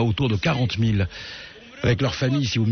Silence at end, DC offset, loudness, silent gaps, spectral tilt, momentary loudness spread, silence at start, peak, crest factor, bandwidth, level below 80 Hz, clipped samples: 0 s; under 0.1%; -23 LUFS; none; -5.5 dB/octave; 14 LU; 0 s; -10 dBFS; 12 dB; 6.6 kHz; -44 dBFS; under 0.1%